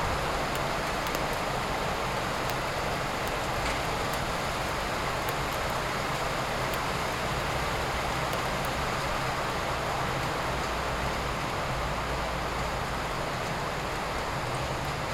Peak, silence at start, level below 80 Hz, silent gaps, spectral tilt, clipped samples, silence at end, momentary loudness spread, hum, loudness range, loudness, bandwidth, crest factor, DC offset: -8 dBFS; 0 s; -42 dBFS; none; -4 dB/octave; under 0.1%; 0 s; 2 LU; none; 1 LU; -30 LUFS; 16.5 kHz; 22 dB; under 0.1%